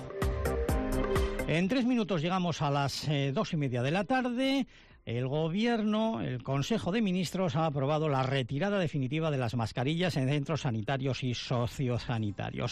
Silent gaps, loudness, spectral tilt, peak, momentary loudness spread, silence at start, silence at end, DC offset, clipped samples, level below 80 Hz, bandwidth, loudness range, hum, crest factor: none; -31 LUFS; -6.5 dB/octave; -20 dBFS; 4 LU; 0 s; 0 s; under 0.1%; under 0.1%; -44 dBFS; 14 kHz; 1 LU; none; 10 dB